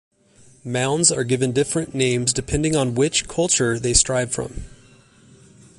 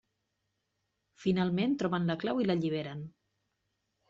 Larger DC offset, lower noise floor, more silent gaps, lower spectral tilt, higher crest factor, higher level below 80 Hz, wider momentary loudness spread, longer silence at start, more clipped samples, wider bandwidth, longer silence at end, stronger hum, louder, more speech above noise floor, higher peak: neither; second, -52 dBFS vs -82 dBFS; neither; second, -3.5 dB/octave vs -6 dB/octave; about the same, 20 dB vs 16 dB; first, -40 dBFS vs -68 dBFS; about the same, 10 LU vs 12 LU; second, 0.65 s vs 1.2 s; neither; first, 11.5 kHz vs 7.4 kHz; about the same, 1.05 s vs 1 s; neither; first, -19 LUFS vs -32 LUFS; second, 32 dB vs 51 dB; first, -2 dBFS vs -18 dBFS